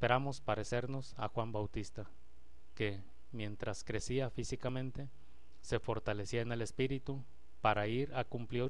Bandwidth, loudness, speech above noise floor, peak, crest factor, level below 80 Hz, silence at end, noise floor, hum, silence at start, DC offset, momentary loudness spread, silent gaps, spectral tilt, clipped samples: 11 kHz; -39 LUFS; 26 dB; -14 dBFS; 24 dB; -56 dBFS; 0 s; -64 dBFS; none; 0 s; 0.7%; 13 LU; none; -5.5 dB/octave; under 0.1%